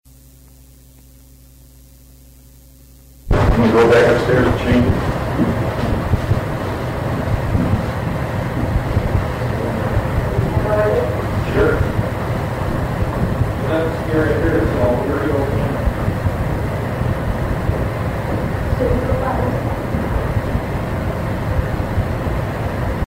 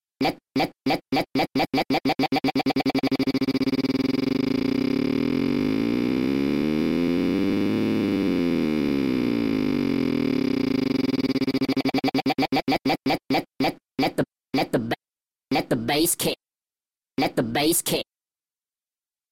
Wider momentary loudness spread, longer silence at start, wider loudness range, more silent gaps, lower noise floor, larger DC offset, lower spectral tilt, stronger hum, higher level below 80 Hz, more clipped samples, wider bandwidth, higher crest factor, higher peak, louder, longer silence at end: about the same, 6 LU vs 4 LU; first, 3.15 s vs 0.2 s; about the same, 5 LU vs 3 LU; neither; second, -44 dBFS vs under -90 dBFS; neither; first, -7.5 dB/octave vs -4.5 dB/octave; neither; first, -26 dBFS vs -54 dBFS; neither; about the same, 16 kHz vs 16.5 kHz; about the same, 12 dB vs 14 dB; first, -6 dBFS vs -10 dBFS; first, -18 LUFS vs -24 LUFS; second, 0.05 s vs 1.3 s